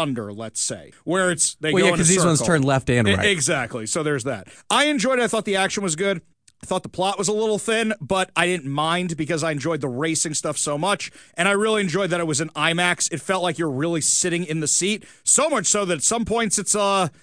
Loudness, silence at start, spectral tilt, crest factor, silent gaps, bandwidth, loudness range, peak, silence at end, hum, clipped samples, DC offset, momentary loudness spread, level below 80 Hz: -21 LUFS; 0 s; -3 dB/octave; 18 dB; none; 10.5 kHz; 4 LU; -4 dBFS; 0.15 s; none; under 0.1%; 0.1%; 7 LU; -52 dBFS